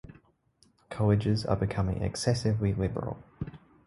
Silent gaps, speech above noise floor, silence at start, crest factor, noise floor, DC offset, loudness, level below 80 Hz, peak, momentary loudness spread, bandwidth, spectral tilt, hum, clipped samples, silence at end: none; 38 dB; 0.1 s; 20 dB; -67 dBFS; under 0.1%; -29 LUFS; -46 dBFS; -10 dBFS; 15 LU; 11.5 kHz; -6.5 dB/octave; none; under 0.1%; 0.3 s